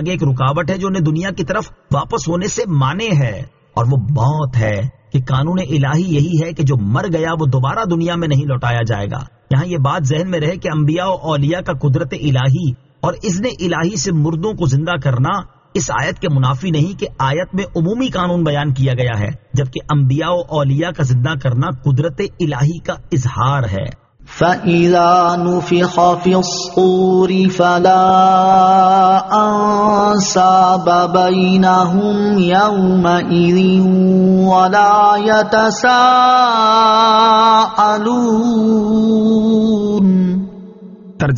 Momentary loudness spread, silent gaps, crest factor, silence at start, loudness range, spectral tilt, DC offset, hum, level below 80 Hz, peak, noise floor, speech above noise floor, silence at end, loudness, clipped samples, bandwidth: 9 LU; none; 14 dB; 0 s; 7 LU; -5.5 dB/octave; under 0.1%; none; -42 dBFS; 0 dBFS; -35 dBFS; 22 dB; 0 s; -14 LUFS; under 0.1%; 7.4 kHz